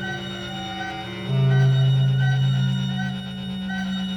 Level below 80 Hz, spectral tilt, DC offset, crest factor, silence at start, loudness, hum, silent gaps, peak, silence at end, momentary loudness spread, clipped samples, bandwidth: -50 dBFS; -7 dB/octave; under 0.1%; 12 dB; 0 s; -23 LUFS; none; none; -10 dBFS; 0 s; 12 LU; under 0.1%; 7.8 kHz